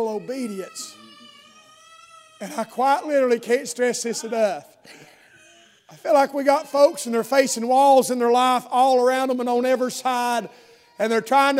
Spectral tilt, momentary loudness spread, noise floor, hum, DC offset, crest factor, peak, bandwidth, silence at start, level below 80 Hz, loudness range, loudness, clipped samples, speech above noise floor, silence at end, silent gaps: -3 dB/octave; 14 LU; -53 dBFS; none; under 0.1%; 18 dB; -4 dBFS; 16 kHz; 0 s; -82 dBFS; 7 LU; -20 LUFS; under 0.1%; 32 dB; 0 s; none